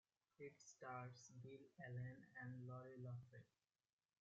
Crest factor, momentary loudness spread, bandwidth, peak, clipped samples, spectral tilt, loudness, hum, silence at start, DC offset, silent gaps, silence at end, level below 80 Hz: 16 dB; 7 LU; 7.6 kHz; -42 dBFS; under 0.1%; -6.5 dB/octave; -58 LUFS; none; 0.4 s; under 0.1%; none; 0.75 s; -88 dBFS